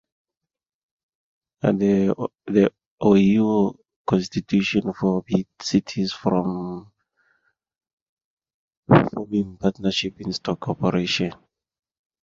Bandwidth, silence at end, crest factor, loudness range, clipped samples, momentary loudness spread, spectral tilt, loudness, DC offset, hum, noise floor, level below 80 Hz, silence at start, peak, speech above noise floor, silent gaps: 7.6 kHz; 0.9 s; 22 dB; 5 LU; under 0.1%; 10 LU; -6.5 dB/octave; -22 LUFS; under 0.1%; none; -88 dBFS; -54 dBFS; 1.65 s; -2 dBFS; 66 dB; 2.87-2.98 s, 3.96-4.05 s, 7.93-8.17 s, 8.24-8.37 s, 8.54-8.68 s, 8.77-8.83 s